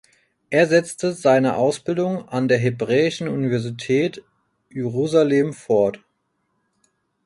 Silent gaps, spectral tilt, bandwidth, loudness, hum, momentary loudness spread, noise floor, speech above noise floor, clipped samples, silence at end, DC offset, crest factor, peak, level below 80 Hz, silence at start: none; -6 dB/octave; 11.5 kHz; -20 LUFS; none; 8 LU; -71 dBFS; 52 dB; under 0.1%; 1.3 s; under 0.1%; 18 dB; -4 dBFS; -62 dBFS; 0.5 s